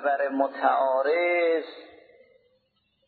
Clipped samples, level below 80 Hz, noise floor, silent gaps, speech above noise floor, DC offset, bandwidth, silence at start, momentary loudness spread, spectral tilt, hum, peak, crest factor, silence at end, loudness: under 0.1%; -82 dBFS; -71 dBFS; none; 47 dB; under 0.1%; 4.7 kHz; 0 s; 5 LU; -6 dB/octave; none; -8 dBFS; 18 dB; 1.2 s; -24 LUFS